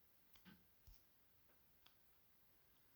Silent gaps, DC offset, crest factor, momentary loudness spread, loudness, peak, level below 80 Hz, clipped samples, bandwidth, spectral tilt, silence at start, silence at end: none; under 0.1%; 26 dB; 3 LU; -68 LUFS; -46 dBFS; -80 dBFS; under 0.1%; over 20 kHz; -4 dB/octave; 0 s; 0 s